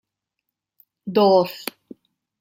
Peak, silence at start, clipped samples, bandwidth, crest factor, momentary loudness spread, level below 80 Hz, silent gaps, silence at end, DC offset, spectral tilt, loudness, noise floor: -4 dBFS; 1.05 s; under 0.1%; 16.5 kHz; 20 dB; 18 LU; -72 dBFS; none; 0.75 s; under 0.1%; -6 dB/octave; -19 LUFS; -82 dBFS